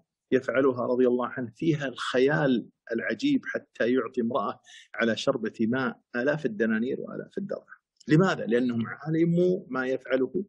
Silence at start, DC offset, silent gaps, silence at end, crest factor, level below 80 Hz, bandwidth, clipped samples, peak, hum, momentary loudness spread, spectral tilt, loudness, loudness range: 0.3 s; under 0.1%; none; 0.05 s; 18 dB; -72 dBFS; 9.6 kHz; under 0.1%; -10 dBFS; none; 11 LU; -7 dB/octave; -27 LUFS; 3 LU